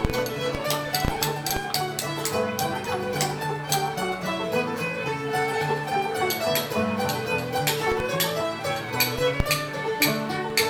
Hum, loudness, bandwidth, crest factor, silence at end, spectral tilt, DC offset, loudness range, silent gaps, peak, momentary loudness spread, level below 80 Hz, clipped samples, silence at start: none; -25 LUFS; over 20 kHz; 20 dB; 0 s; -3.5 dB/octave; under 0.1%; 2 LU; none; -6 dBFS; 5 LU; -44 dBFS; under 0.1%; 0 s